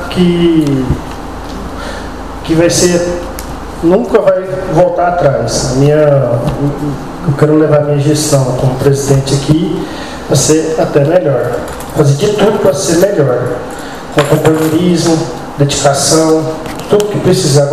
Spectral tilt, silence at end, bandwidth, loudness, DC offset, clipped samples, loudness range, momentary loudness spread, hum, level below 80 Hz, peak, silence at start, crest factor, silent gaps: -5.5 dB/octave; 0 s; 15 kHz; -11 LUFS; 2%; 0.4%; 2 LU; 13 LU; none; -30 dBFS; 0 dBFS; 0 s; 10 dB; none